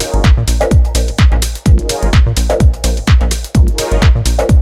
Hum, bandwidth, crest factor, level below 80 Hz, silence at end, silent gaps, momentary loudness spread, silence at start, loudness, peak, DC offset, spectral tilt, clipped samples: none; 14.5 kHz; 10 dB; -12 dBFS; 0 s; none; 2 LU; 0 s; -12 LUFS; 0 dBFS; under 0.1%; -5.5 dB/octave; under 0.1%